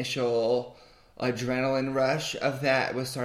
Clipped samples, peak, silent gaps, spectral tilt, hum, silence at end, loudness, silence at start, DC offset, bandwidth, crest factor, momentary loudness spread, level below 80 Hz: under 0.1%; -12 dBFS; none; -5 dB/octave; none; 0 s; -27 LUFS; 0 s; under 0.1%; 16 kHz; 16 dB; 5 LU; -60 dBFS